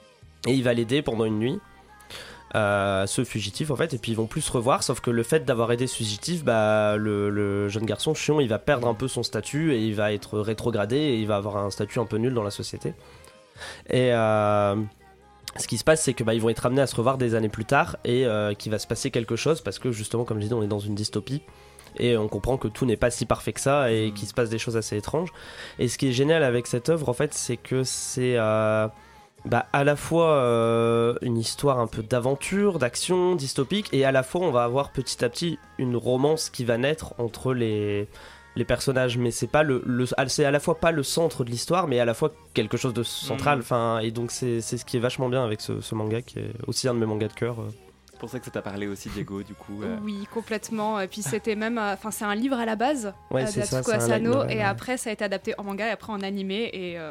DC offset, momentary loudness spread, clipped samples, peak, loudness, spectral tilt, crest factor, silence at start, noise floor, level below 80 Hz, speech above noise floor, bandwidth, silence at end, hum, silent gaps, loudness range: under 0.1%; 10 LU; under 0.1%; -6 dBFS; -25 LUFS; -5 dB/octave; 18 dB; 0.25 s; -46 dBFS; -52 dBFS; 21 dB; 16 kHz; 0 s; none; none; 4 LU